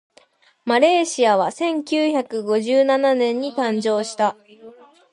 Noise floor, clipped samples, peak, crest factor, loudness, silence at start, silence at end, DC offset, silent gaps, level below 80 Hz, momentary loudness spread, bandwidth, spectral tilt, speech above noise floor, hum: -55 dBFS; under 0.1%; -2 dBFS; 18 dB; -19 LUFS; 0.65 s; 0.45 s; under 0.1%; none; -72 dBFS; 7 LU; 11 kHz; -3.5 dB/octave; 37 dB; none